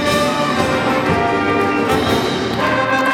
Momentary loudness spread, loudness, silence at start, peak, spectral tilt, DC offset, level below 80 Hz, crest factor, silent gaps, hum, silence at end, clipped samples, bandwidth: 2 LU; -16 LUFS; 0 s; -2 dBFS; -5 dB/octave; under 0.1%; -44 dBFS; 14 dB; none; none; 0 s; under 0.1%; 17 kHz